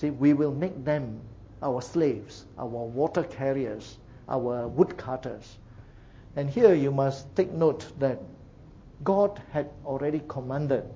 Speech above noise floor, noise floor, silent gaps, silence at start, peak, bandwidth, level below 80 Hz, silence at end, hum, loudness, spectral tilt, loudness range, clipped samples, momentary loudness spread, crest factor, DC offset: 22 dB; -49 dBFS; none; 0 s; -6 dBFS; 7.8 kHz; -54 dBFS; 0 s; none; -28 LUFS; -8 dB/octave; 5 LU; under 0.1%; 16 LU; 22 dB; under 0.1%